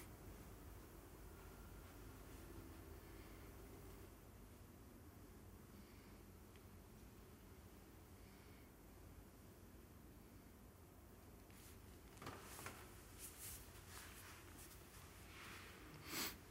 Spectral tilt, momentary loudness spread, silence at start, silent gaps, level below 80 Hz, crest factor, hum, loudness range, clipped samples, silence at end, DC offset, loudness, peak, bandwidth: -3.5 dB/octave; 9 LU; 0 s; none; -66 dBFS; 26 dB; none; 7 LU; under 0.1%; 0 s; under 0.1%; -58 LUFS; -34 dBFS; 16 kHz